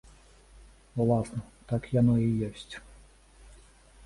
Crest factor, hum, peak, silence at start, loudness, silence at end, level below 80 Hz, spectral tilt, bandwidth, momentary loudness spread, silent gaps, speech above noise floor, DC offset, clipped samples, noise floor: 18 dB; none; -12 dBFS; 0.95 s; -29 LUFS; 1.25 s; -52 dBFS; -8.5 dB/octave; 11.5 kHz; 19 LU; none; 28 dB; under 0.1%; under 0.1%; -55 dBFS